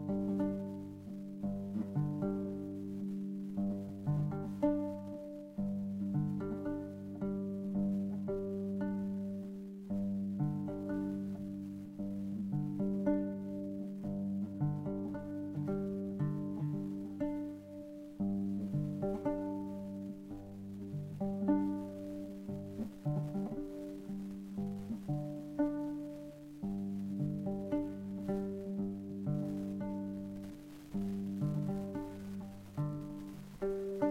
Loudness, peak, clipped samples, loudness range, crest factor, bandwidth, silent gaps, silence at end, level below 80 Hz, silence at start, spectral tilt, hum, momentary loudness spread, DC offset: -39 LUFS; -20 dBFS; under 0.1%; 3 LU; 18 dB; 13.5 kHz; none; 0 s; -60 dBFS; 0 s; -9.5 dB/octave; none; 9 LU; under 0.1%